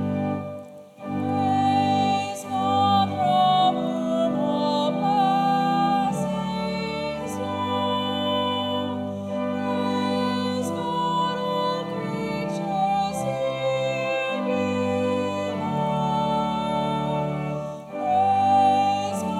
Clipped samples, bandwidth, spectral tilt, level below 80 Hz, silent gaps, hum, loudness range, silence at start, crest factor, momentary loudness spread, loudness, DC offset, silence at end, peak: under 0.1%; 14.5 kHz; -6 dB/octave; -58 dBFS; none; none; 4 LU; 0 s; 14 dB; 9 LU; -24 LUFS; under 0.1%; 0 s; -8 dBFS